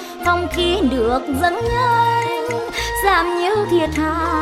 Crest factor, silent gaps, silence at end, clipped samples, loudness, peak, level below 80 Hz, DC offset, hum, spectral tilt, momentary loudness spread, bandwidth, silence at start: 16 dB; none; 0 s; under 0.1%; -18 LUFS; -2 dBFS; -34 dBFS; under 0.1%; none; -5 dB/octave; 5 LU; 16.5 kHz; 0 s